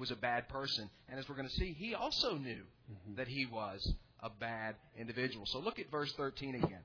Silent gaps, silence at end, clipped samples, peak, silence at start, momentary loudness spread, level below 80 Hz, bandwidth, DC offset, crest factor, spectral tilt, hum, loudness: none; 0 s; under 0.1%; -20 dBFS; 0 s; 12 LU; -52 dBFS; 5.4 kHz; under 0.1%; 20 dB; -3 dB/octave; none; -40 LUFS